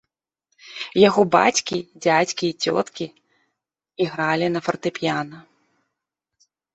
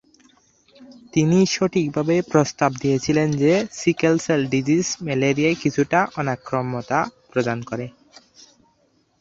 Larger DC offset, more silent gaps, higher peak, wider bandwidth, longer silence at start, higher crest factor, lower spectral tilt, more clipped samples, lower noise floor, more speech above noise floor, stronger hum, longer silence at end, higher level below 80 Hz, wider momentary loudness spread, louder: neither; neither; about the same, -2 dBFS vs -2 dBFS; about the same, 8.4 kHz vs 7.8 kHz; second, 0.65 s vs 0.8 s; about the same, 20 dB vs 18 dB; second, -4 dB/octave vs -5.5 dB/octave; neither; first, -82 dBFS vs -63 dBFS; first, 62 dB vs 43 dB; neither; about the same, 1.35 s vs 1.3 s; second, -64 dBFS vs -56 dBFS; first, 16 LU vs 7 LU; about the same, -21 LUFS vs -21 LUFS